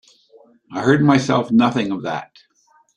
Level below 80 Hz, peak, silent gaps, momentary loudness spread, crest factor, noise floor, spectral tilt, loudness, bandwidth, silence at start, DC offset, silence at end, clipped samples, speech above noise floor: -58 dBFS; -2 dBFS; none; 13 LU; 18 dB; -58 dBFS; -6.5 dB/octave; -17 LUFS; 10 kHz; 0.7 s; under 0.1%; 0.7 s; under 0.1%; 42 dB